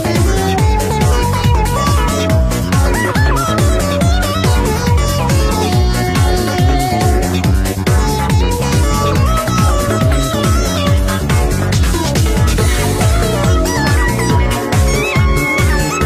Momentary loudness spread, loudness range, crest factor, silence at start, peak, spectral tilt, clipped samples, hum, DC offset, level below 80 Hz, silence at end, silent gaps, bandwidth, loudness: 1 LU; 0 LU; 10 dB; 0 s; -2 dBFS; -5 dB/octave; under 0.1%; none; under 0.1%; -18 dBFS; 0 s; none; 15.5 kHz; -13 LUFS